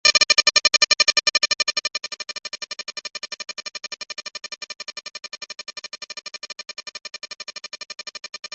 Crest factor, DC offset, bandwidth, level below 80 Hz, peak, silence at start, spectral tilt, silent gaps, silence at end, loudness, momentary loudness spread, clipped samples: 22 dB; under 0.1%; 8.6 kHz; -66 dBFS; -2 dBFS; 0.05 s; 3 dB/octave; 8.39-8.43 s; 0.05 s; -19 LUFS; 19 LU; under 0.1%